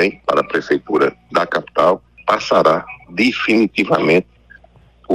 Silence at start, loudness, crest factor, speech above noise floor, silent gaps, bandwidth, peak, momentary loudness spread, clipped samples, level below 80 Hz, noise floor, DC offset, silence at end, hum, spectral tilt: 0 s; -16 LUFS; 16 dB; 32 dB; none; 13.5 kHz; 0 dBFS; 5 LU; under 0.1%; -52 dBFS; -48 dBFS; under 0.1%; 0 s; none; -5.5 dB/octave